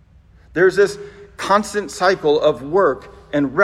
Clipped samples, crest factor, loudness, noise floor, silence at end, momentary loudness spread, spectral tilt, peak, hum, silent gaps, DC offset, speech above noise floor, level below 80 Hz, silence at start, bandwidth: under 0.1%; 18 dB; -18 LUFS; -48 dBFS; 0 s; 14 LU; -5 dB/octave; 0 dBFS; none; none; under 0.1%; 32 dB; -50 dBFS; 0.55 s; 13 kHz